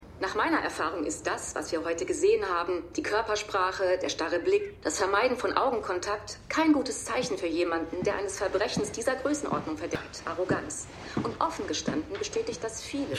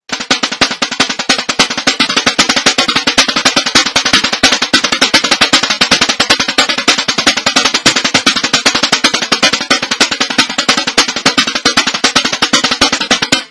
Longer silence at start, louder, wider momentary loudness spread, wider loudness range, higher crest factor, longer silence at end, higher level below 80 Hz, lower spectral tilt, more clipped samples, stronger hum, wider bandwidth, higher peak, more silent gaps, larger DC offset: about the same, 0 s vs 0.1 s; second, -29 LUFS vs -9 LUFS; first, 8 LU vs 3 LU; about the same, 4 LU vs 2 LU; first, 22 dB vs 12 dB; about the same, 0 s vs 0.05 s; second, -54 dBFS vs -44 dBFS; first, -3.5 dB/octave vs -1 dB/octave; second, under 0.1% vs 2%; neither; first, 13.5 kHz vs 11 kHz; second, -6 dBFS vs 0 dBFS; neither; neither